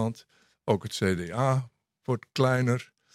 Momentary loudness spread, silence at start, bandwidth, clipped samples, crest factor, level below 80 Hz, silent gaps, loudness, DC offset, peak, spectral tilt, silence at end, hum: 16 LU; 0 s; 13.5 kHz; under 0.1%; 20 dB; -66 dBFS; none; -28 LUFS; under 0.1%; -8 dBFS; -6.5 dB/octave; 0.3 s; none